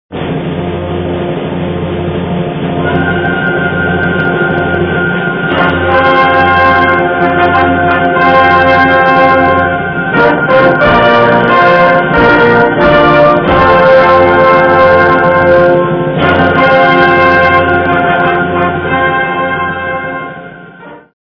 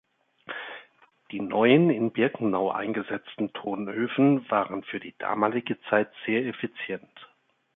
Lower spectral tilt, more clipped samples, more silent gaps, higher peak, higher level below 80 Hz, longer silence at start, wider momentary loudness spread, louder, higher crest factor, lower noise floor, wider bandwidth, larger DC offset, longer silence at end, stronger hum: second, -8 dB/octave vs -10.5 dB/octave; first, 1% vs under 0.1%; neither; first, 0 dBFS vs -6 dBFS; first, -34 dBFS vs -72 dBFS; second, 0.1 s vs 0.5 s; second, 10 LU vs 16 LU; first, -8 LUFS vs -26 LUFS; second, 8 dB vs 20 dB; second, -31 dBFS vs -65 dBFS; first, 5.4 kHz vs 4 kHz; neither; second, 0.2 s vs 0.5 s; neither